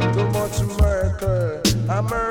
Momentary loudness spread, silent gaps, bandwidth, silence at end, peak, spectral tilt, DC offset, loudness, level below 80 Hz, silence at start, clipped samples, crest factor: 3 LU; none; 18 kHz; 0 s; -6 dBFS; -5.5 dB/octave; under 0.1%; -21 LUFS; -28 dBFS; 0 s; under 0.1%; 14 dB